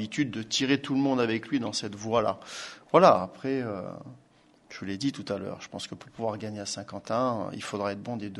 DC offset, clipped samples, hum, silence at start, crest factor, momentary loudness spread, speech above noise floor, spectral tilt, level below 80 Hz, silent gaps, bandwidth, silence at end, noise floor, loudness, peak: under 0.1%; under 0.1%; none; 0 s; 24 dB; 14 LU; 27 dB; -5 dB/octave; -66 dBFS; none; 11.5 kHz; 0 s; -55 dBFS; -28 LUFS; -4 dBFS